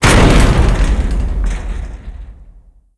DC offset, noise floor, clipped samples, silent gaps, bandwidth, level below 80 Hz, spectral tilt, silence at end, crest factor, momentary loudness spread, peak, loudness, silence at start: under 0.1%; -42 dBFS; 0.3%; none; 11 kHz; -14 dBFS; -5 dB/octave; 0.55 s; 12 dB; 23 LU; 0 dBFS; -14 LUFS; 0 s